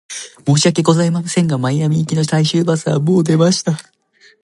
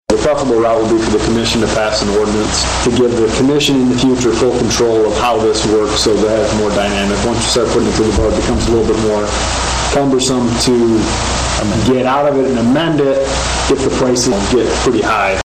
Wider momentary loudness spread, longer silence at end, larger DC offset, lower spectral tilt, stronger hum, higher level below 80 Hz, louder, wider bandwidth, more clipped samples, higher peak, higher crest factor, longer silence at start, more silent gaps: first, 6 LU vs 3 LU; first, 0.65 s vs 0.05 s; neither; about the same, -5.5 dB/octave vs -4.5 dB/octave; neither; second, -58 dBFS vs -26 dBFS; about the same, -15 LUFS vs -13 LUFS; second, 11.5 kHz vs 15.5 kHz; neither; about the same, 0 dBFS vs 0 dBFS; about the same, 14 dB vs 12 dB; about the same, 0.1 s vs 0.1 s; neither